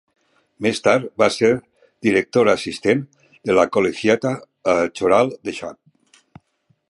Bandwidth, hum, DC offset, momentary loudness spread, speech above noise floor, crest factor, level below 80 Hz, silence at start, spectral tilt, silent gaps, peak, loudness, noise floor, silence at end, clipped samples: 11.5 kHz; none; under 0.1%; 11 LU; 47 dB; 18 dB; -56 dBFS; 0.6 s; -5 dB/octave; none; -2 dBFS; -19 LUFS; -65 dBFS; 1.15 s; under 0.1%